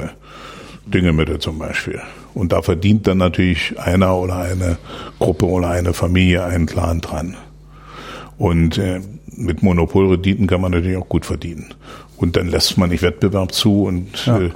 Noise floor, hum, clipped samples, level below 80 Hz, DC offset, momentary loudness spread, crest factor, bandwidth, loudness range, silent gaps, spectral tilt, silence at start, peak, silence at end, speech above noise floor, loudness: -39 dBFS; none; under 0.1%; -32 dBFS; under 0.1%; 18 LU; 16 dB; 16.5 kHz; 2 LU; none; -6 dB/octave; 0 s; -2 dBFS; 0 s; 22 dB; -17 LUFS